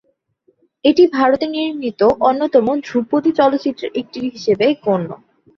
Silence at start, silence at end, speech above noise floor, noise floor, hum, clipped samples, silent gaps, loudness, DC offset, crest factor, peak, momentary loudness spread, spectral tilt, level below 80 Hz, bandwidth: 0.85 s; 0.4 s; 45 dB; -61 dBFS; none; under 0.1%; none; -16 LUFS; under 0.1%; 16 dB; -2 dBFS; 11 LU; -6.5 dB/octave; -56 dBFS; 7 kHz